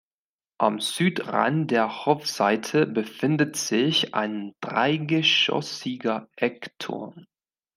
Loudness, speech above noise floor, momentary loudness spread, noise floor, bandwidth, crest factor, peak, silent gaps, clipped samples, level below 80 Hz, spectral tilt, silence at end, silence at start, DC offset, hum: -24 LUFS; over 66 dB; 11 LU; under -90 dBFS; 16 kHz; 22 dB; -4 dBFS; none; under 0.1%; -74 dBFS; -4 dB/octave; 0.55 s; 0.6 s; under 0.1%; none